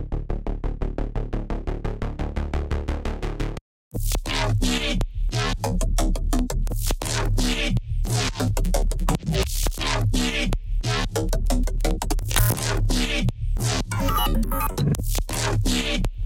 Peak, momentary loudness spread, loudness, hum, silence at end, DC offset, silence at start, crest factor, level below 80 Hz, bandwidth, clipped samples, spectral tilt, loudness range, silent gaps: -2 dBFS; 8 LU; -25 LUFS; none; 0 s; under 0.1%; 0 s; 22 dB; -26 dBFS; 17 kHz; under 0.1%; -4.5 dB/octave; 6 LU; 3.61-3.91 s